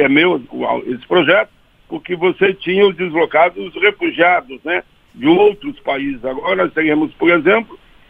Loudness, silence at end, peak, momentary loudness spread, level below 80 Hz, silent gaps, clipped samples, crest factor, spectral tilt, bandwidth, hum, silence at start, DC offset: -15 LUFS; 0.35 s; 0 dBFS; 10 LU; -52 dBFS; none; under 0.1%; 16 dB; -7.5 dB/octave; 4.8 kHz; none; 0 s; under 0.1%